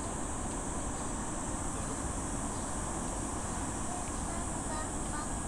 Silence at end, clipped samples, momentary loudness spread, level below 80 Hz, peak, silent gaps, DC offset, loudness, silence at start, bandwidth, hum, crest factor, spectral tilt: 0 s; under 0.1%; 1 LU; -42 dBFS; -22 dBFS; none; under 0.1%; -36 LUFS; 0 s; 15.5 kHz; none; 14 dB; -4 dB/octave